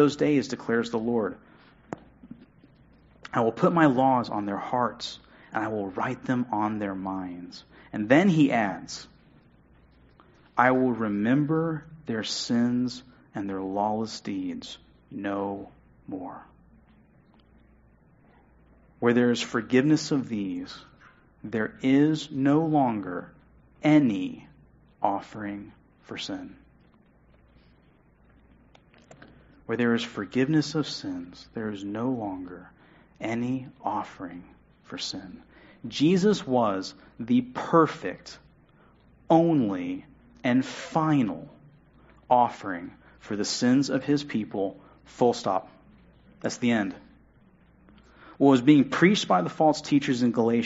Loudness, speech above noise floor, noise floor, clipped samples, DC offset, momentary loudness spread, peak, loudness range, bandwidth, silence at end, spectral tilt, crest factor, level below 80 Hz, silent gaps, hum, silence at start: -26 LUFS; 34 dB; -60 dBFS; under 0.1%; under 0.1%; 19 LU; -6 dBFS; 10 LU; 8 kHz; 0 s; -6 dB/octave; 22 dB; -62 dBFS; none; none; 0 s